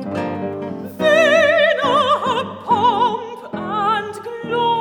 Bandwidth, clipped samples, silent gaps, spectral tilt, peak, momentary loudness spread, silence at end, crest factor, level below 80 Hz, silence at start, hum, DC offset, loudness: 19.5 kHz; under 0.1%; none; -4.5 dB/octave; -2 dBFS; 15 LU; 0 s; 16 dB; -62 dBFS; 0 s; none; under 0.1%; -17 LUFS